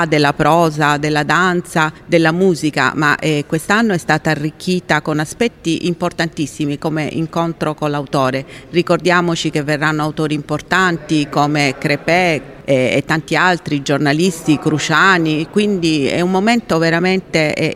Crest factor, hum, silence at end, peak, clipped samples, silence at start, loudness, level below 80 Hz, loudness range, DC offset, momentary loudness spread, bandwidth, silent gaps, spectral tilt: 14 dB; none; 0 s; 0 dBFS; under 0.1%; 0 s; -15 LUFS; -46 dBFS; 4 LU; under 0.1%; 7 LU; 15 kHz; none; -5 dB/octave